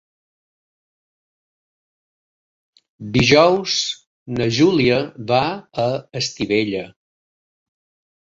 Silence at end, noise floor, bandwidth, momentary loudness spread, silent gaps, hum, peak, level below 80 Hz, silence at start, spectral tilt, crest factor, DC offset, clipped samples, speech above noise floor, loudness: 1.4 s; under -90 dBFS; 7.8 kHz; 15 LU; 4.06-4.26 s; none; -2 dBFS; -50 dBFS; 3 s; -4.5 dB/octave; 20 dB; under 0.1%; under 0.1%; over 72 dB; -18 LUFS